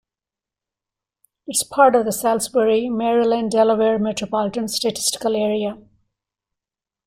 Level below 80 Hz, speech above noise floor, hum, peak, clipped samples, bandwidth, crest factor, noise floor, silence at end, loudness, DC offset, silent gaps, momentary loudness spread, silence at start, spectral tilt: -60 dBFS; 70 dB; none; -2 dBFS; under 0.1%; 16 kHz; 20 dB; -89 dBFS; 1.25 s; -19 LUFS; under 0.1%; none; 8 LU; 1.5 s; -3.5 dB/octave